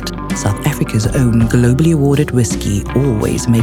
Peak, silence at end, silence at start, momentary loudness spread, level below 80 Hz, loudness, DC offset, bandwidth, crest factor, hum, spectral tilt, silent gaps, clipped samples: 0 dBFS; 0 s; 0 s; 6 LU; -26 dBFS; -14 LUFS; under 0.1%; 16.5 kHz; 12 dB; none; -6.5 dB/octave; none; under 0.1%